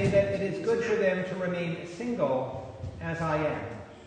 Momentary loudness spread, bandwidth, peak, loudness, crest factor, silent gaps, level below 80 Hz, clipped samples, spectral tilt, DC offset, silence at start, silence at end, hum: 11 LU; 9.6 kHz; -12 dBFS; -30 LUFS; 16 dB; none; -54 dBFS; under 0.1%; -7 dB/octave; under 0.1%; 0 s; 0 s; none